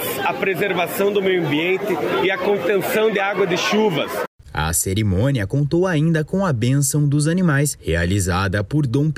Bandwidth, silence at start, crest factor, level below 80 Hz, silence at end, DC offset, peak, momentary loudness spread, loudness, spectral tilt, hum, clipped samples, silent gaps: 16 kHz; 0 s; 14 dB; -40 dBFS; 0 s; under 0.1%; -6 dBFS; 3 LU; -19 LUFS; -5 dB/octave; none; under 0.1%; 4.28-4.39 s